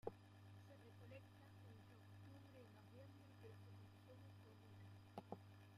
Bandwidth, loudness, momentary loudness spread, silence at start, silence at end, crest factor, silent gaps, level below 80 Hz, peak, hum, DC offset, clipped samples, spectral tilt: 15 kHz; -63 LUFS; 5 LU; 0.05 s; 0 s; 28 dB; none; -86 dBFS; -34 dBFS; none; under 0.1%; under 0.1%; -7 dB/octave